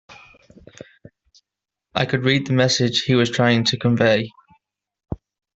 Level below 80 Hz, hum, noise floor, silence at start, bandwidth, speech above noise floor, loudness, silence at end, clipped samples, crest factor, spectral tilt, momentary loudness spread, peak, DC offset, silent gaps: -52 dBFS; none; -86 dBFS; 0.1 s; 8 kHz; 68 dB; -18 LUFS; 0.45 s; under 0.1%; 20 dB; -5 dB/octave; 18 LU; -2 dBFS; under 0.1%; none